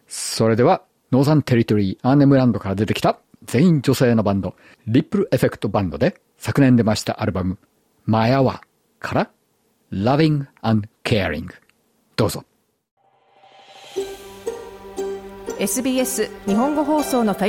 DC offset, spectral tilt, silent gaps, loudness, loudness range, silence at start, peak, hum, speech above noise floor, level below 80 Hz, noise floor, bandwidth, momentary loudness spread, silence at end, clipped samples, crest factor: under 0.1%; -6 dB/octave; 12.91-12.97 s; -19 LUFS; 11 LU; 0.1 s; -4 dBFS; none; 46 dB; -52 dBFS; -64 dBFS; 17 kHz; 15 LU; 0 s; under 0.1%; 16 dB